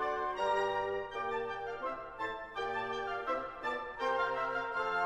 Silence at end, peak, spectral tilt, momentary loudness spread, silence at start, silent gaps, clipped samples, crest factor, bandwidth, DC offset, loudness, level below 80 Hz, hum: 0 s; -20 dBFS; -4 dB/octave; 7 LU; 0 s; none; under 0.1%; 16 dB; 12 kHz; under 0.1%; -36 LUFS; -62 dBFS; none